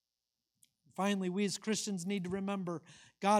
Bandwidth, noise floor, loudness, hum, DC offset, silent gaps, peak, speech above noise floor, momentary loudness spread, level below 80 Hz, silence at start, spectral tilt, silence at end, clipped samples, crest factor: 15.5 kHz; -90 dBFS; -37 LUFS; none; under 0.1%; none; -16 dBFS; 55 dB; 8 LU; -76 dBFS; 1 s; -4.5 dB/octave; 0 s; under 0.1%; 20 dB